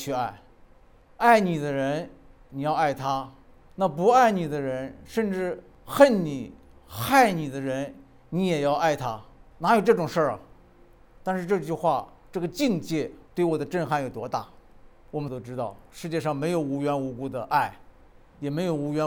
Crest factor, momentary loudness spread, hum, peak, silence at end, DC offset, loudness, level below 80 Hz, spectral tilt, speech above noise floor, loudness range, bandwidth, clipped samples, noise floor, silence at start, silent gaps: 24 dB; 15 LU; none; -2 dBFS; 0 s; under 0.1%; -26 LUFS; -56 dBFS; -6 dB/octave; 29 dB; 6 LU; over 20 kHz; under 0.1%; -54 dBFS; 0 s; none